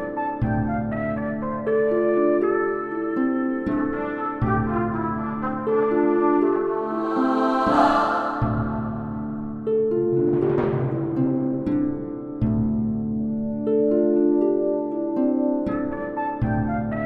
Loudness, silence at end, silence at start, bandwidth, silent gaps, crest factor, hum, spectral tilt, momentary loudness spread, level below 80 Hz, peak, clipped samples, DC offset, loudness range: -23 LUFS; 0 s; 0 s; 7.6 kHz; none; 16 dB; none; -9.5 dB/octave; 7 LU; -44 dBFS; -6 dBFS; under 0.1%; under 0.1%; 3 LU